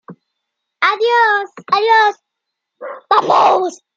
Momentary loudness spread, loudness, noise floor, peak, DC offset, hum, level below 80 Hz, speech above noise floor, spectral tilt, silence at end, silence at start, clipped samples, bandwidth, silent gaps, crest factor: 13 LU; -13 LUFS; -78 dBFS; -2 dBFS; under 0.1%; none; -76 dBFS; 64 dB; -3 dB/octave; 0.2 s; 0.1 s; under 0.1%; 7.8 kHz; none; 14 dB